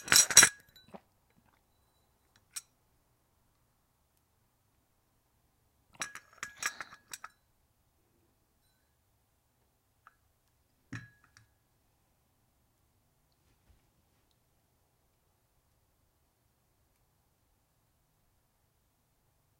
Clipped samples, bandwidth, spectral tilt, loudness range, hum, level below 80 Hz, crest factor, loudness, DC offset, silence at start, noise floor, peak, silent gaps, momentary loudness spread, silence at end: under 0.1%; 16 kHz; 1 dB/octave; 14 LU; none; -70 dBFS; 36 dB; -23 LUFS; under 0.1%; 0.05 s; -74 dBFS; -2 dBFS; none; 29 LU; 8.6 s